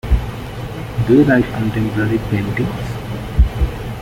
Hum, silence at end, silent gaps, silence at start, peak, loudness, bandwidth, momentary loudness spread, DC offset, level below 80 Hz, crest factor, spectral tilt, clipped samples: none; 0 s; none; 0.05 s; -2 dBFS; -18 LUFS; 16 kHz; 14 LU; under 0.1%; -22 dBFS; 14 dB; -8 dB/octave; under 0.1%